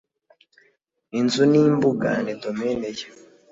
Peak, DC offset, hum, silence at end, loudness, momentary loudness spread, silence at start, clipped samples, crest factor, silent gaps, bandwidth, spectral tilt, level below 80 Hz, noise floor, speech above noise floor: -6 dBFS; under 0.1%; none; 0.4 s; -21 LUFS; 15 LU; 1.15 s; under 0.1%; 16 dB; none; 7.8 kHz; -6 dB/octave; -60 dBFS; -65 dBFS; 45 dB